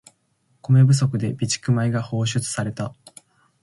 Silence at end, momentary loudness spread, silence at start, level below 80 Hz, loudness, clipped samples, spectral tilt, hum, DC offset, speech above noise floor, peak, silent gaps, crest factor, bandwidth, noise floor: 0.7 s; 14 LU; 0.7 s; -56 dBFS; -21 LUFS; under 0.1%; -5.5 dB/octave; none; under 0.1%; 46 dB; -6 dBFS; none; 16 dB; 11.5 kHz; -66 dBFS